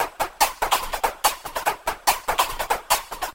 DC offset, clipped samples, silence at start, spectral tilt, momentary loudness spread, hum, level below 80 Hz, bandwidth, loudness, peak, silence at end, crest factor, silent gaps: under 0.1%; under 0.1%; 0 s; 0 dB/octave; 5 LU; none; -42 dBFS; 17 kHz; -23 LUFS; -4 dBFS; 0 s; 20 dB; none